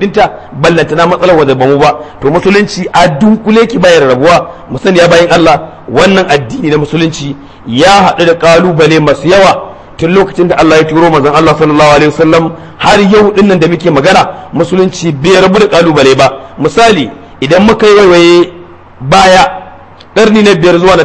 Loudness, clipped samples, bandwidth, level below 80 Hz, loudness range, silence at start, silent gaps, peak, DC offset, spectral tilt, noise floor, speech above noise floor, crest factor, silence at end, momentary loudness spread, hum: -6 LUFS; 6%; 11 kHz; -32 dBFS; 2 LU; 0 s; none; 0 dBFS; under 0.1%; -5.5 dB/octave; -31 dBFS; 26 dB; 6 dB; 0 s; 9 LU; none